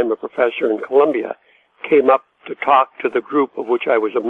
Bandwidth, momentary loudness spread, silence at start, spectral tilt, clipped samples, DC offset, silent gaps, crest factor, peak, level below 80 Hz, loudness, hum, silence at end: 4 kHz; 11 LU; 0 s; -7 dB/octave; under 0.1%; under 0.1%; none; 16 dB; 0 dBFS; -70 dBFS; -17 LUFS; none; 0 s